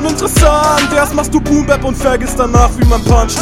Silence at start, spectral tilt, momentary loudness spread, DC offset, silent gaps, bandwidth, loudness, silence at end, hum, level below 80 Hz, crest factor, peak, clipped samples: 0 s; -5 dB/octave; 4 LU; 0.3%; none; 16.5 kHz; -11 LUFS; 0 s; none; -16 dBFS; 10 dB; 0 dBFS; 0.6%